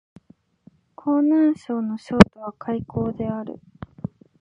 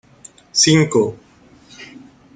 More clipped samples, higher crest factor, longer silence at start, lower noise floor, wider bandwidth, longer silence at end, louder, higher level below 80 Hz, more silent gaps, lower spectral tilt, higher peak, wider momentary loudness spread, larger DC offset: neither; about the same, 22 dB vs 18 dB; first, 1.05 s vs 0.55 s; first, -55 dBFS vs -48 dBFS; first, 11 kHz vs 9.6 kHz; first, 0.9 s vs 0.35 s; second, -21 LUFS vs -15 LUFS; first, -42 dBFS vs -56 dBFS; neither; first, -7.5 dB/octave vs -3.5 dB/octave; about the same, 0 dBFS vs -2 dBFS; second, 21 LU vs 25 LU; neither